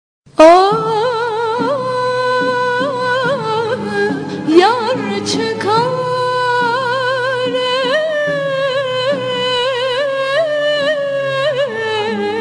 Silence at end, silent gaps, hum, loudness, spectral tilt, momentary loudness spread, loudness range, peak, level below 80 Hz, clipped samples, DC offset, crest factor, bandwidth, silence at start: 0 s; none; none; -15 LUFS; -4.5 dB/octave; 7 LU; 2 LU; 0 dBFS; -56 dBFS; under 0.1%; under 0.1%; 14 dB; 10.5 kHz; 0.4 s